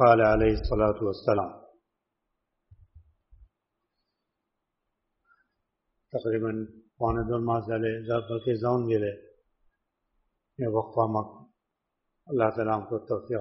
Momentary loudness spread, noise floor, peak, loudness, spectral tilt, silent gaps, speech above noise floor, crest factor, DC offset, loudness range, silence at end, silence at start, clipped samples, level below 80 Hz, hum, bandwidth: 9 LU; -83 dBFS; -4 dBFS; -28 LUFS; -6.5 dB/octave; none; 57 dB; 24 dB; under 0.1%; 8 LU; 0 s; 0 s; under 0.1%; -46 dBFS; none; 5.8 kHz